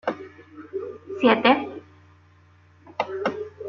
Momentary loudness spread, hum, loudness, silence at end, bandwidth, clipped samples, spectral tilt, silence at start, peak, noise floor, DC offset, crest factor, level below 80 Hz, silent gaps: 23 LU; none; -23 LUFS; 0 s; 6.8 kHz; under 0.1%; -6 dB/octave; 0.05 s; -2 dBFS; -55 dBFS; under 0.1%; 24 dB; -70 dBFS; none